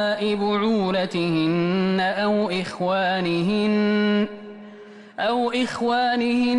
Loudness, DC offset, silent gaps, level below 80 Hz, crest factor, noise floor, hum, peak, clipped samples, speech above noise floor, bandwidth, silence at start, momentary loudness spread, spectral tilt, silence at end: -22 LUFS; under 0.1%; none; -60 dBFS; 10 dB; -43 dBFS; none; -12 dBFS; under 0.1%; 22 dB; 11 kHz; 0 s; 6 LU; -6.5 dB/octave; 0 s